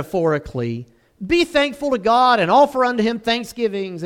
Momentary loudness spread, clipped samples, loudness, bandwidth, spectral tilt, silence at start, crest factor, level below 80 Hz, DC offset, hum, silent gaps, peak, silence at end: 12 LU; under 0.1%; -18 LUFS; 16.5 kHz; -5.5 dB/octave; 0 s; 16 dB; -48 dBFS; under 0.1%; none; none; -4 dBFS; 0 s